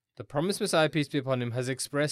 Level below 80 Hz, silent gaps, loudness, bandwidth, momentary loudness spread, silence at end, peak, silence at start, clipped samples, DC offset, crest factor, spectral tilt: -68 dBFS; none; -29 LUFS; 15 kHz; 6 LU; 0 s; -12 dBFS; 0.2 s; under 0.1%; under 0.1%; 16 dB; -5 dB/octave